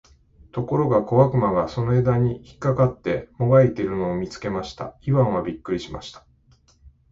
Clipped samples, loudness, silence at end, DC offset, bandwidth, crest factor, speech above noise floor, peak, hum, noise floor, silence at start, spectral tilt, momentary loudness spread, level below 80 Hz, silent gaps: under 0.1%; -22 LUFS; 0.95 s; under 0.1%; 7.6 kHz; 20 dB; 36 dB; -4 dBFS; none; -58 dBFS; 0.55 s; -8.5 dB/octave; 13 LU; -46 dBFS; none